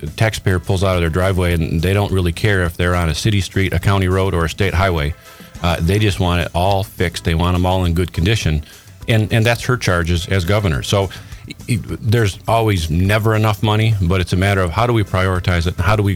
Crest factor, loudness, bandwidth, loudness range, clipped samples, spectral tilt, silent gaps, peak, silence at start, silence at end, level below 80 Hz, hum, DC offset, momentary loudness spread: 14 dB; -17 LUFS; 16 kHz; 2 LU; under 0.1%; -6 dB/octave; none; -2 dBFS; 0 s; 0 s; -30 dBFS; none; under 0.1%; 5 LU